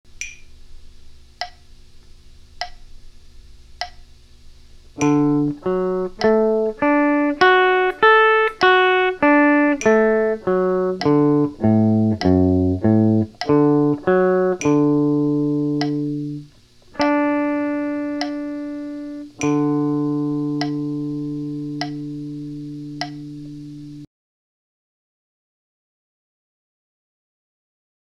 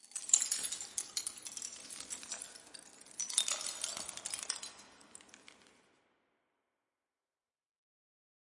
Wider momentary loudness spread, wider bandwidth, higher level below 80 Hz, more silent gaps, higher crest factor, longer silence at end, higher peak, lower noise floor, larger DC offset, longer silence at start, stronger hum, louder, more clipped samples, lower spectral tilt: second, 18 LU vs 24 LU; second, 7.6 kHz vs 11.5 kHz; first, -48 dBFS vs -84 dBFS; neither; second, 20 dB vs 34 dB; first, 3.95 s vs 3 s; first, 0 dBFS vs -8 dBFS; second, -48 dBFS vs under -90 dBFS; neither; first, 0.2 s vs 0.05 s; neither; first, -18 LUFS vs -36 LUFS; neither; first, -6.5 dB/octave vs 2.5 dB/octave